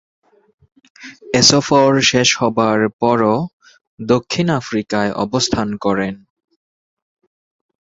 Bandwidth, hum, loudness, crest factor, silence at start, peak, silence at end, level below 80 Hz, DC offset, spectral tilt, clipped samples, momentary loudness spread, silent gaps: 8 kHz; none; -15 LUFS; 18 dB; 1 s; 0 dBFS; 1.7 s; -50 dBFS; under 0.1%; -4 dB/octave; under 0.1%; 10 LU; 2.93-2.99 s, 3.53-3.60 s, 3.81-3.97 s